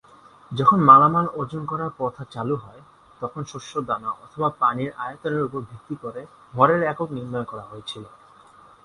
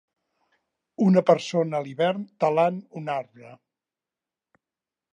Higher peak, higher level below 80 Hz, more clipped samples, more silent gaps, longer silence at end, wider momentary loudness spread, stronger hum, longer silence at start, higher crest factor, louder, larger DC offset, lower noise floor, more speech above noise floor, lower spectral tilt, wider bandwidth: first, 0 dBFS vs -6 dBFS; first, -60 dBFS vs -80 dBFS; neither; neither; second, 0.75 s vs 1.55 s; first, 19 LU vs 12 LU; neither; second, 0.5 s vs 1 s; about the same, 22 dB vs 22 dB; first, -21 LUFS vs -24 LUFS; neither; second, -50 dBFS vs -90 dBFS; second, 28 dB vs 66 dB; about the same, -7 dB/octave vs -7 dB/octave; first, 11 kHz vs 9.2 kHz